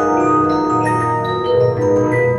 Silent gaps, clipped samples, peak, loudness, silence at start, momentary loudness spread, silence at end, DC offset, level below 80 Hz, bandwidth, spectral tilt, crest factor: none; under 0.1%; -4 dBFS; -15 LUFS; 0 s; 3 LU; 0 s; under 0.1%; -46 dBFS; 11.5 kHz; -7.5 dB/octave; 12 dB